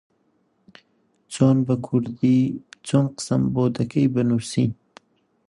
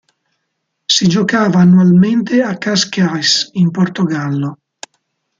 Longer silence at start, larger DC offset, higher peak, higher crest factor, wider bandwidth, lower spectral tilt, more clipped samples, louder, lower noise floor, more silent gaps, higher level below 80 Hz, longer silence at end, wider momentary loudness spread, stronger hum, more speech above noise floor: first, 1.3 s vs 0.9 s; neither; second, -4 dBFS vs 0 dBFS; about the same, 18 dB vs 14 dB; first, 11.5 kHz vs 7.6 kHz; first, -7 dB/octave vs -5 dB/octave; neither; second, -22 LUFS vs -12 LUFS; second, -66 dBFS vs -71 dBFS; neither; about the same, -56 dBFS vs -56 dBFS; about the same, 0.75 s vs 0.85 s; second, 7 LU vs 11 LU; neither; second, 46 dB vs 59 dB